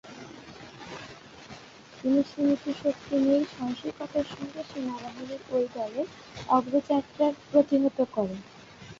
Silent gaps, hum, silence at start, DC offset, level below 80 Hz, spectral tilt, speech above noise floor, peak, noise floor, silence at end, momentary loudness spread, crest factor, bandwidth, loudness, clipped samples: none; none; 0.05 s; under 0.1%; -64 dBFS; -6.5 dB/octave; 21 dB; -8 dBFS; -49 dBFS; 0.05 s; 21 LU; 20 dB; 7.6 kHz; -28 LUFS; under 0.1%